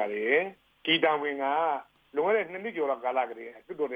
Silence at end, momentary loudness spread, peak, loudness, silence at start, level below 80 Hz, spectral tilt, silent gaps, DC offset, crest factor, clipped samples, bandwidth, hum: 0 s; 11 LU; -10 dBFS; -29 LUFS; 0 s; -78 dBFS; -6 dB/octave; none; under 0.1%; 18 dB; under 0.1%; 5 kHz; none